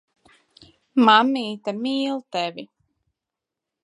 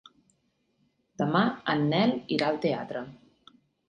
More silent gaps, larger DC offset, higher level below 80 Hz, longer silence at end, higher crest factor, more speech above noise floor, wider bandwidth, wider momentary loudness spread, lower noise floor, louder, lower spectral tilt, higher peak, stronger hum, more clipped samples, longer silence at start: neither; neither; second, -74 dBFS vs -68 dBFS; first, 1.2 s vs 0.75 s; about the same, 22 dB vs 22 dB; first, 66 dB vs 46 dB; about the same, 10.5 kHz vs 9.6 kHz; about the same, 14 LU vs 12 LU; first, -86 dBFS vs -73 dBFS; first, -21 LUFS vs -27 LUFS; second, -4.5 dB/octave vs -7 dB/octave; first, -2 dBFS vs -8 dBFS; neither; neither; second, 0.95 s vs 1.2 s